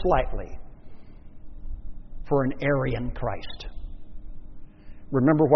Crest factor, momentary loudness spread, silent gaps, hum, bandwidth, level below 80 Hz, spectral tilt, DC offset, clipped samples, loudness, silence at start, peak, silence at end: 22 dB; 24 LU; none; none; 6 kHz; -36 dBFS; -7 dB/octave; under 0.1%; under 0.1%; -26 LUFS; 0 s; -4 dBFS; 0 s